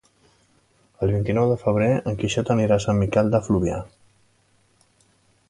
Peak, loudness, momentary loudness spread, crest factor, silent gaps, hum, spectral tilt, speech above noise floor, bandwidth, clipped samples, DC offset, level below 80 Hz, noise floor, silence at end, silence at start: -6 dBFS; -22 LUFS; 7 LU; 18 dB; none; none; -7 dB/octave; 41 dB; 11 kHz; under 0.1%; under 0.1%; -44 dBFS; -62 dBFS; 1.65 s; 1 s